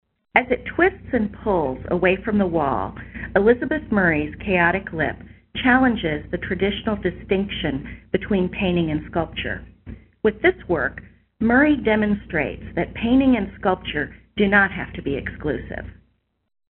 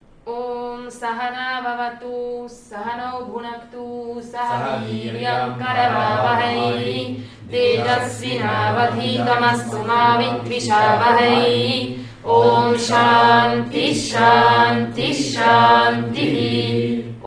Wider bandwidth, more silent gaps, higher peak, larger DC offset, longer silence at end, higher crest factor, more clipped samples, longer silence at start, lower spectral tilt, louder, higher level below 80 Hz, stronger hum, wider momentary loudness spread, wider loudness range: second, 4.2 kHz vs 11 kHz; neither; about the same, -2 dBFS vs 0 dBFS; neither; first, 0.75 s vs 0 s; about the same, 20 dB vs 18 dB; neither; about the same, 0.35 s vs 0.25 s; about the same, -4.5 dB/octave vs -4.5 dB/octave; second, -21 LUFS vs -17 LUFS; first, -40 dBFS vs -52 dBFS; neither; second, 11 LU vs 16 LU; second, 3 LU vs 12 LU